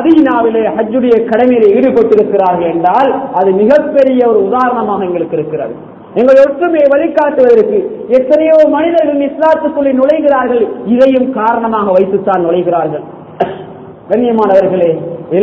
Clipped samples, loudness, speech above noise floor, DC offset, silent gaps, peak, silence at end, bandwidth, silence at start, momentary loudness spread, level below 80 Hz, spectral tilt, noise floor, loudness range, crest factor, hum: 1%; -10 LUFS; 20 dB; under 0.1%; none; 0 dBFS; 0 s; 7.2 kHz; 0 s; 9 LU; -48 dBFS; -8.5 dB/octave; -29 dBFS; 3 LU; 10 dB; none